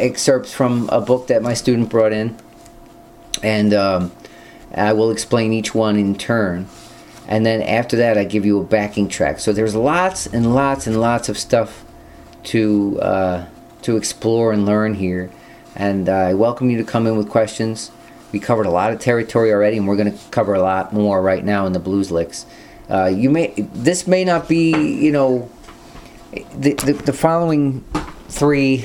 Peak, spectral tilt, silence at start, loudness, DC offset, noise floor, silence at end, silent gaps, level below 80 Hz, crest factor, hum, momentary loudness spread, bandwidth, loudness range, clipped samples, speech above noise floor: 0 dBFS; -5.5 dB/octave; 0 s; -17 LUFS; under 0.1%; -42 dBFS; 0 s; none; -46 dBFS; 18 dB; none; 11 LU; 16.5 kHz; 2 LU; under 0.1%; 25 dB